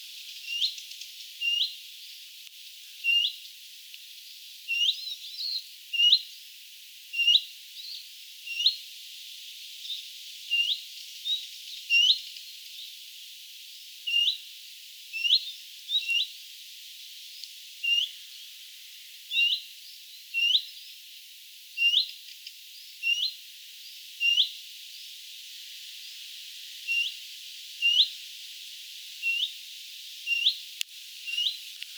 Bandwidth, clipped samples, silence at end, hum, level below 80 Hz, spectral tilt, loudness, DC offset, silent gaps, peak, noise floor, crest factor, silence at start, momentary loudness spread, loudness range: over 20 kHz; under 0.1%; 0 s; none; under -90 dBFS; 12.5 dB/octave; -26 LUFS; under 0.1%; none; -8 dBFS; -48 dBFS; 24 dB; 0 s; 21 LU; 5 LU